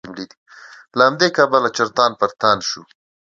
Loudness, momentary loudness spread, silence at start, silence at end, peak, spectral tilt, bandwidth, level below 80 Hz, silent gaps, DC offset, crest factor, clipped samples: -17 LUFS; 18 LU; 0.05 s; 0.5 s; 0 dBFS; -3.5 dB/octave; 7.8 kHz; -62 dBFS; 0.37-0.46 s; under 0.1%; 18 dB; under 0.1%